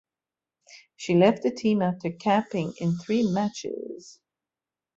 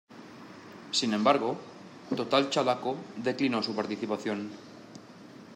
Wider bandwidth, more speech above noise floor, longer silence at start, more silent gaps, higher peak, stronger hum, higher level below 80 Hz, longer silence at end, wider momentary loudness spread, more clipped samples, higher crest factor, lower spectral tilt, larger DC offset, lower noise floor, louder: second, 7.8 kHz vs 12 kHz; first, over 65 dB vs 20 dB; first, 0.7 s vs 0.1 s; neither; about the same, -8 dBFS vs -10 dBFS; neither; first, -68 dBFS vs -80 dBFS; first, 0.85 s vs 0 s; second, 15 LU vs 23 LU; neither; about the same, 18 dB vs 22 dB; first, -6.5 dB/octave vs -4 dB/octave; neither; first, under -90 dBFS vs -49 dBFS; first, -25 LUFS vs -29 LUFS